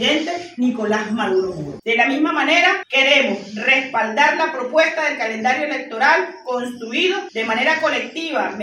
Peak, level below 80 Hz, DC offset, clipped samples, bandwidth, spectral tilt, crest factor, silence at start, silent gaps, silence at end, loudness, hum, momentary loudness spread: -2 dBFS; -64 dBFS; under 0.1%; under 0.1%; 12.5 kHz; -3 dB/octave; 16 dB; 0 s; none; 0 s; -18 LUFS; none; 9 LU